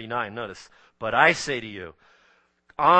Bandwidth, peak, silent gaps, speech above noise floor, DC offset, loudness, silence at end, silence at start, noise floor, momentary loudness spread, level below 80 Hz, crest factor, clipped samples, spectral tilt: 8.8 kHz; -2 dBFS; none; 36 dB; under 0.1%; -24 LUFS; 0 s; 0 s; -63 dBFS; 23 LU; -60 dBFS; 22 dB; under 0.1%; -3.5 dB/octave